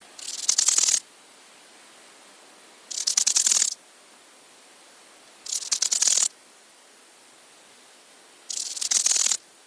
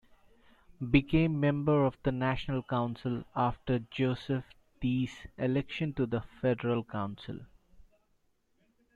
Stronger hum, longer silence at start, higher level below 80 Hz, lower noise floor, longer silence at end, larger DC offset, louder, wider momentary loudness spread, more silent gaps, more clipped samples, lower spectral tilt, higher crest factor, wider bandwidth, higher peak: neither; second, 0.2 s vs 0.8 s; second, -86 dBFS vs -52 dBFS; second, -53 dBFS vs -73 dBFS; second, 0.3 s vs 1.15 s; neither; first, -21 LUFS vs -32 LUFS; first, 14 LU vs 10 LU; neither; neither; second, 4.5 dB/octave vs -8.5 dB/octave; about the same, 26 dB vs 22 dB; first, 11 kHz vs 7.6 kHz; first, -2 dBFS vs -10 dBFS